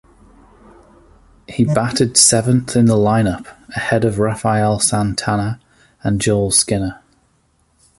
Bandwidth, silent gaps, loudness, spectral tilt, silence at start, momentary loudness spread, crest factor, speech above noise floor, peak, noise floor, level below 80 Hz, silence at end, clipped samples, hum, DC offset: 12 kHz; none; -15 LUFS; -4 dB/octave; 1.5 s; 15 LU; 18 dB; 44 dB; 0 dBFS; -59 dBFS; -42 dBFS; 1.05 s; under 0.1%; none; under 0.1%